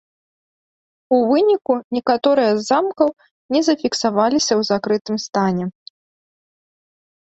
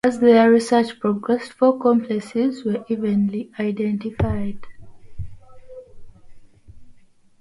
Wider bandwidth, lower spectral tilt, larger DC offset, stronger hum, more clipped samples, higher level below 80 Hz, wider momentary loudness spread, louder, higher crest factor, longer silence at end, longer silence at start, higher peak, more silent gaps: second, 8.2 kHz vs 11.5 kHz; second, -4.5 dB/octave vs -7 dB/octave; neither; neither; neither; second, -62 dBFS vs -44 dBFS; second, 6 LU vs 18 LU; about the same, -18 LUFS vs -20 LUFS; about the same, 16 dB vs 18 dB; first, 1.6 s vs 0.5 s; first, 1.1 s vs 0.05 s; about the same, -2 dBFS vs -4 dBFS; first, 1.84-1.91 s, 3.31-3.49 s, 5.01-5.05 s vs none